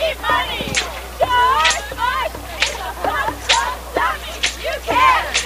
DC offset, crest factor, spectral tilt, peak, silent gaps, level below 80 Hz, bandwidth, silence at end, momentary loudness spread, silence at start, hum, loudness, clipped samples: under 0.1%; 18 dB; -1.5 dB/octave; 0 dBFS; none; -34 dBFS; 15.5 kHz; 0 s; 9 LU; 0 s; none; -18 LUFS; under 0.1%